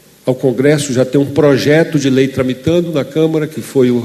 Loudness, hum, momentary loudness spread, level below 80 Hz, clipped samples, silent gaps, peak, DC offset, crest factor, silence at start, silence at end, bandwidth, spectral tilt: -13 LUFS; none; 6 LU; -50 dBFS; under 0.1%; none; 0 dBFS; under 0.1%; 12 dB; 0.25 s; 0 s; 13.5 kHz; -6 dB/octave